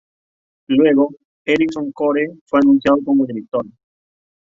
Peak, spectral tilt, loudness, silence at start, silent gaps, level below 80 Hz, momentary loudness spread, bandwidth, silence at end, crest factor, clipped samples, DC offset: -2 dBFS; -7 dB/octave; -17 LUFS; 0.7 s; 1.25-1.45 s, 2.41-2.46 s; -56 dBFS; 11 LU; 7.2 kHz; 0.8 s; 14 dB; under 0.1%; under 0.1%